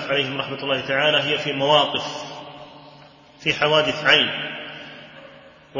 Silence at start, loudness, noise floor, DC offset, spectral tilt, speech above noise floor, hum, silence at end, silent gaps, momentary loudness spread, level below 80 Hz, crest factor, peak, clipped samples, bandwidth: 0 s; -20 LUFS; -47 dBFS; under 0.1%; -4 dB/octave; 27 dB; none; 0 s; none; 21 LU; -62 dBFS; 20 dB; -4 dBFS; under 0.1%; 7.4 kHz